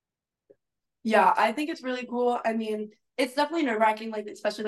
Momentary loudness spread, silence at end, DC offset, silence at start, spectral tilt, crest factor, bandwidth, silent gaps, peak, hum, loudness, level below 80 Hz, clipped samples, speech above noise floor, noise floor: 12 LU; 0 s; under 0.1%; 1.05 s; -4.5 dB/octave; 18 dB; 12.5 kHz; none; -10 dBFS; none; -26 LUFS; -80 dBFS; under 0.1%; 57 dB; -84 dBFS